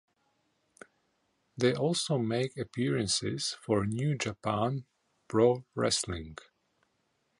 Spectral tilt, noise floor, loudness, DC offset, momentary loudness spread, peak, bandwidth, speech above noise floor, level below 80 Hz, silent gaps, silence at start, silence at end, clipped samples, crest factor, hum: -4.5 dB/octave; -76 dBFS; -31 LUFS; under 0.1%; 10 LU; -12 dBFS; 11.5 kHz; 46 dB; -58 dBFS; none; 1.55 s; 1.05 s; under 0.1%; 20 dB; none